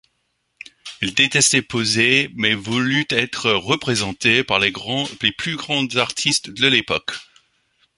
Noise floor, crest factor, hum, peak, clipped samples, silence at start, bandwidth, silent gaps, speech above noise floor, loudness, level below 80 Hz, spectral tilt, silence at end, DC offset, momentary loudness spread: -70 dBFS; 20 dB; none; 0 dBFS; under 0.1%; 0.85 s; 11.5 kHz; none; 51 dB; -18 LUFS; -54 dBFS; -2.5 dB/octave; 0.75 s; under 0.1%; 9 LU